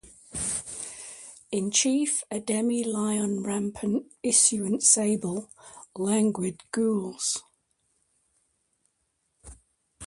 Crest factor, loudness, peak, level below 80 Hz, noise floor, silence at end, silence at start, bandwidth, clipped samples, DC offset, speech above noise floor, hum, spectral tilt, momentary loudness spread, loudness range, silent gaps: 22 dB; -25 LUFS; -6 dBFS; -62 dBFS; -75 dBFS; 0 s; 0.05 s; 11.5 kHz; under 0.1%; under 0.1%; 49 dB; none; -3 dB/octave; 17 LU; 9 LU; none